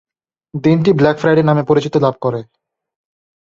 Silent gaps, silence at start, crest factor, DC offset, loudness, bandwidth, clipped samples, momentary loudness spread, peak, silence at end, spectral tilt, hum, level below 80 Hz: none; 0.55 s; 14 dB; under 0.1%; -14 LUFS; 7.4 kHz; under 0.1%; 9 LU; -2 dBFS; 1 s; -8 dB/octave; none; -52 dBFS